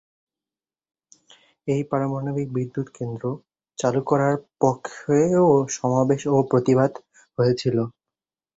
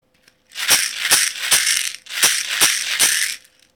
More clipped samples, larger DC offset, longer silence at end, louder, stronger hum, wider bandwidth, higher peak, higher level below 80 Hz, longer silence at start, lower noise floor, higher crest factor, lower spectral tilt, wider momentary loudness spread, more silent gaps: neither; neither; first, 0.65 s vs 0.4 s; second, -22 LUFS vs -16 LUFS; neither; second, 8 kHz vs over 20 kHz; second, -4 dBFS vs 0 dBFS; about the same, -60 dBFS vs -58 dBFS; first, 1.65 s vs 0.55 s; first, under -90 dBFS vs -56 dBFS; about the same, 20 dB vs 20 dB; first, -7 dB/octave vs 2.5 dB/octave; first, 12 LU vs 9 LU; neither